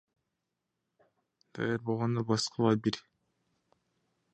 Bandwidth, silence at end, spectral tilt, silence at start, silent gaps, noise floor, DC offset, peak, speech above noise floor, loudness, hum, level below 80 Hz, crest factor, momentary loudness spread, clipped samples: 9.8 kHz; 1.35 s; -5.5 dB/octave; 1.55 s; none; -85 dBFS; under 0.1%; -12 dBFS; 55 dB; -31 LUFS; none; -70 dBFS; 22 dB; 10 LU; under 0.1%